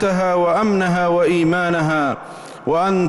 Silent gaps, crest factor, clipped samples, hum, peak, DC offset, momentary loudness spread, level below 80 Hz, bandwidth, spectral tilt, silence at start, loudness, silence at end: none; 10 dB; under 0.1%; none; -8 dBFS; under 0.1%; 9 LU; -50 dBFS; 12 kHz; -6.5 dB/octave; 0 s; -17 LUFS; 0 s